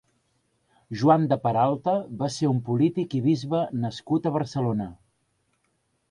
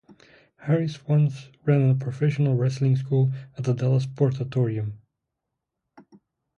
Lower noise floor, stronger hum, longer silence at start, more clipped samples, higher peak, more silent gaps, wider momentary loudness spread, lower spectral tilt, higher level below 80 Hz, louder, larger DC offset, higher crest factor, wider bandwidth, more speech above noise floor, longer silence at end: second, -72 dBFS vs -83 dBFS; neither; first, 0.9 s vs 0.1 s; neither; about the same, -6 dBFS vs -8 dBFS; neither; about the same, 9 LU vs 7 LU; second, -7.5 dB/octave vs -9 dB/octave; about the same, -62 dBFS vs -62 dBFS; about the same, -25 LUFS vs -24 LUFS; neither; about the same, 20 dB vs 16 dB; first, 11 kHz vs 7 kHz; second, 48 dB vs 60 dB; second, 1.15 s vs 1.6 s